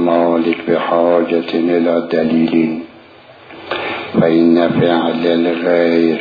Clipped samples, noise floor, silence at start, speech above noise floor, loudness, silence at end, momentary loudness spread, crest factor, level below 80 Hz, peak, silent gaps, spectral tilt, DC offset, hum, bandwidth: under 0.1%; -40 dBFS; 0 s; 27 dB; -14 LUFS; 0 s; 8 LU; 14 dB; -58 dBFS; 0 dBFS; none; -8.5 dB/octave; under 0.1%; none; 5 kHz